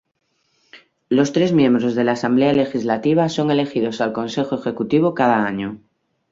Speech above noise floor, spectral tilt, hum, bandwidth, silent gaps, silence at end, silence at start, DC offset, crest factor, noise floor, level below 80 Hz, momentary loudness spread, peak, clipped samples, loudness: 51 dB; -6.5 dB/octave; none; 7.8 kHz; none; 0.55 s; 0.75 s; under 0.1%; 16 dB; -68 dBFS; -58 dBFS; 7 LU; -2 dBFS; under 0.1%; -18 LUFS